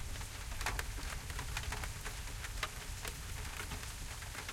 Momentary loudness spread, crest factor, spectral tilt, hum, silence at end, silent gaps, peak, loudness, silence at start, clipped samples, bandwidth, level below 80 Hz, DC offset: 5 LU; 22 dB; -2.5 dB/octave; none; 0 s; none; -20 dBFS; -43 LUFS; 0 s; under 0.1%; 16.5 kHz; -46 dBFS; under 0.1%